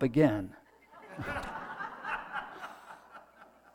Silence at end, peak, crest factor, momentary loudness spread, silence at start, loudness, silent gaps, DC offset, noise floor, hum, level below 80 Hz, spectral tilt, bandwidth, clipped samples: 0.3 s; -12 dBFS; 22 dB; 24 LU; 0 s; -35 LUFS; none; under 0.1%; -58 dBFS; none; -58 dBFS; -7.5 dB/octave; 15.5 kHz; under 0.1%